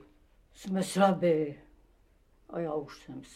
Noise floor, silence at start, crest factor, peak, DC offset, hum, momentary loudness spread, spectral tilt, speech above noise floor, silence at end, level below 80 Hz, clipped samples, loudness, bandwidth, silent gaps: -64 dBFS; 0.6 s; 20 dB; -12 dBFS; under 0.1%; none; 21 LU; -6 dB/octave; 34 dB; 0.1 s; -64 dBFS; under 0.1%; -30 LUFS; 15 kHz; none